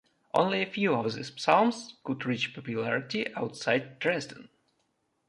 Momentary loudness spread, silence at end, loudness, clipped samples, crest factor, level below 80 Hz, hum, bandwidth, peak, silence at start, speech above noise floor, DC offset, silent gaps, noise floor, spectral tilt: 10 LU; 0.85 s; -29 LUFS; under 0.1%; 22 dB; -74 dBFS; none; 11.5 kHz; -8 dBFS; 0.35 s; 46 dB; under 0.1%; none; -76 dBFS; -5 dB/octave